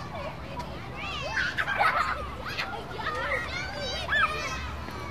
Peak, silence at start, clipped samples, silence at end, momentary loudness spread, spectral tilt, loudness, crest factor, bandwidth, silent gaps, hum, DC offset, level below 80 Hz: -12 dBFS; 0 s; under 0.1%; 0 s; 12 LU; -3.5 dB/octave; -30 LUFS; 20 dB; 15.5 kHz; none; none; 0.4%; -44 dBFS